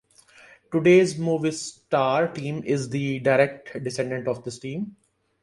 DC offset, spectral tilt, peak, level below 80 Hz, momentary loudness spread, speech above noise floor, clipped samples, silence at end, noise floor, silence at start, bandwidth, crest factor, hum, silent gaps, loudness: under 0.1%; -6 dB/octave; -6 dBFS; -64 dBFS; 15 LU; 30 dB; under 0.1%; 0.5 s; -53 dBFS; 0.7 s; 11.5 kHz; 18 dB; none; none; -24 LUFS